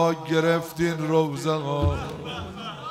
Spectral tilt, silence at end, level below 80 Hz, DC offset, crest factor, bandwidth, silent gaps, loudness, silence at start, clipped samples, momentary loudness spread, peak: -6 dB/octave; 0 s; -44 dBFS; under 0.1%; 16 dB; 16 kHz; none; -25 LUFS; 0 s; under 0.1%; 12 LU; -10 dBFS